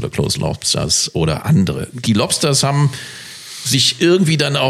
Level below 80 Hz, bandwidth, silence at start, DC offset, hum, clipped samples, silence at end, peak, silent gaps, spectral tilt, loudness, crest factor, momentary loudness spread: -42 dBFS; 14.5 kHz; 0 s; under 0.1%; none; under 0.1%; 0 s; -2 dBFS; none; -4 dB/octave; -15 LUFS; 14 dB; 11 LU